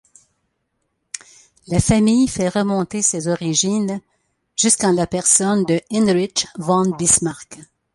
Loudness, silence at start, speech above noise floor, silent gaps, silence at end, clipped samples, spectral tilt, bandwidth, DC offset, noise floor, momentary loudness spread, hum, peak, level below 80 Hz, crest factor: -17 LUFS; 1.15 s; 54 dB; none; 0.3 s; under 0.1%; -4 dB/octave; 11.5 kHz; under 0.1%; -72 dBFS; 14 LU; none; 0 dBFS; -44 dBFS; 20 dB